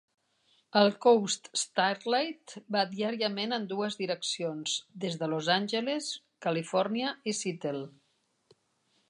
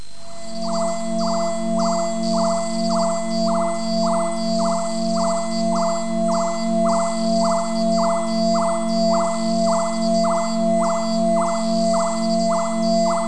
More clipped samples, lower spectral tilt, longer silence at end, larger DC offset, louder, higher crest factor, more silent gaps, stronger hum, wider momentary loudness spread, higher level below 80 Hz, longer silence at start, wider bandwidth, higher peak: neither; second, -3.5 dB/octave vs -5 dB/octave; first, 1.2 s vs 0 s; second, under 0.1% vs 4%; second, -30 LUFS vs -20 LUFS; first, 20 dB vs 12 dB; neither; second, none vs 50 Hz at -55 dBFS; first, 10 LU vs 3 LU; second, -86 dBFS vs -54 dBFS; first, 0.75 s vs 0 s; about the same, 11.5 kHz vs 10.5 kHz; about the same, -10 dBFS vs -8 dBFS